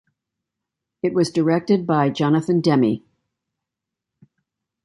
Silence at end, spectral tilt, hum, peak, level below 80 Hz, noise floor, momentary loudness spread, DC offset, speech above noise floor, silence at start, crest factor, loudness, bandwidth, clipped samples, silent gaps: 1.85 s; -7 dB/octave; none; -4 dBFS; -64 dBFS; -85 dBFS; 5 LU; under 0.1%; 66 dB; 1.05 s; 18 dB; -20 LUFS; 11.5 kHz; under 0.1%; none